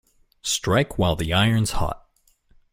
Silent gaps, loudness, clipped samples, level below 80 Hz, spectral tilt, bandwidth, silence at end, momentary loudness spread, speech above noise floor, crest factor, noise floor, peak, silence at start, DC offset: none; -22 LUFS; under 0.1%; -38 dBFS; -4.5 dB/octave; 16.5 kHz; 0.75 s; 11 LU; 39 dB; 18 dB; -61 dBFS; -6 dBFS; 0.45 s; under 0.1%